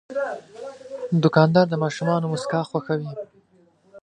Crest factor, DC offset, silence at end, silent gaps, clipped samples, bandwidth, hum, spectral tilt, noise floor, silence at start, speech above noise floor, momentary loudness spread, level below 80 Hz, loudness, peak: 22 dB; under 0.1%; 0.05 s; none; under 0.1%; 9.6 kHz; none; -7 dB/octave; -59 dBFS; 0.1 s; 37 dB; 20 LU; -66 dBFS; -22 LUFS; -2 dBFS